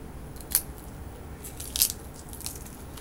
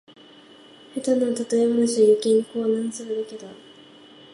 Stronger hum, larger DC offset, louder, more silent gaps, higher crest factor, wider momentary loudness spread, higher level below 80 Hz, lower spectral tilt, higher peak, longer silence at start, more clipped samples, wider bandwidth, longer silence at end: neither; neither; second, -28 LUFS vs -22 LUFS; neither; first, 34 dB vs 16 dB; about the same, 18 LU vs 17 LU; first, -44 dBFS vs -76 dBFS; second, -1.5 dB/octave vs -5 dB/octave; first, 0 dBFS vs -8 dBFS; second, 0 s vs 0.95 s; neither; first, 17 kHz vs 11.5 kHz; second, 0 s vs 0.8 s